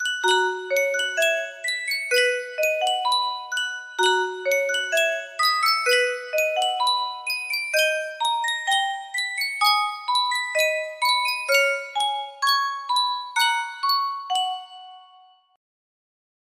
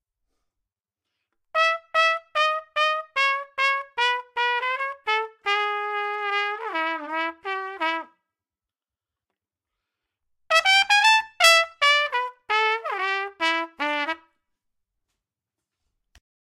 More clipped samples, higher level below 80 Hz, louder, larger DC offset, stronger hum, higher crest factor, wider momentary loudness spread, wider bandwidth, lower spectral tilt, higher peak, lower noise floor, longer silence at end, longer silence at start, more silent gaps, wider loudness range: neither; about the same, -78 dBFS vs -74 dBFS; about the same, -22 LUFS vs -22 LUFS; neither; neither; second, 18 dB vs 26 dB; second, 6 LU vs 11 LU; about the same, 16 kHz vs 16 kHz; about the same, 1.5 dB/octave vs 1.5 dB/octave; second, -6 dBFS vs 0 dBFS; second, -54 dBFS vs under -90 dBFS; second, 1.5 s vs 2.4 s; second, 0 s vs 1.55 s; neither; second, 2 LU vs 11 LU